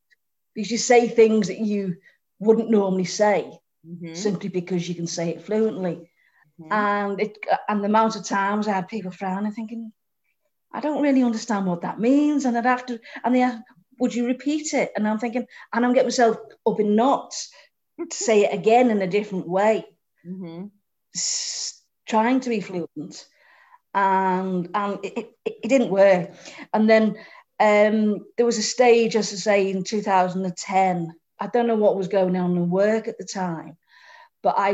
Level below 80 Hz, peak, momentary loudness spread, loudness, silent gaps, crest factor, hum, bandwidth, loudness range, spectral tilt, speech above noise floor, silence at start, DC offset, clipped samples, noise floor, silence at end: -72 dBFS; -4 dBFS; 16 LU; -22 LUFS; none; 18 dB; none; 8.4 kHz; 6 LU; -5 dB/octave; 53 dB; 0.55 s; under 0.1%; under 0.1%; -75 dBFS; 0 s